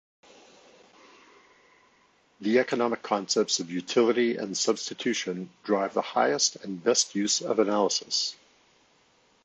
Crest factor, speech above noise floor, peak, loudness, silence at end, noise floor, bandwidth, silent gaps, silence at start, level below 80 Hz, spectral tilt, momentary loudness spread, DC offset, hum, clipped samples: 20 dB; 37 dB; -8 dBFS; -26 LUFS; 1.1 s; -64 dBFS; 9.2 kHz; none; 2.4 s; -78 dBFS; -2.5 dB/octave; 6 LU; under 0.1%; none; under 0.1%